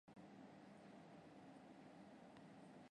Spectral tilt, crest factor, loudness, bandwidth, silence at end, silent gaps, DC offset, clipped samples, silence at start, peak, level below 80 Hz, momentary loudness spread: -6 dB/octave; 14 dB; -63 LUFS; 10.5 kHz; 0 s; none; under 0.1%; under 0.1%; 0.05 s; -48 dBFS; -90 dBFS; 1 LU